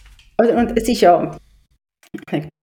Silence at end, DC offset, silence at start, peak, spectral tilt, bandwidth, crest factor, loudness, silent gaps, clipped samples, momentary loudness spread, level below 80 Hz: 0.15 s; under 0.1%; 0.4 s; -2 dBFS; -5.5 dB/octave; 17.5 kHz; 16 dB; -17 LUFS; none; under 0.1%; 17 LU; -42 dBFS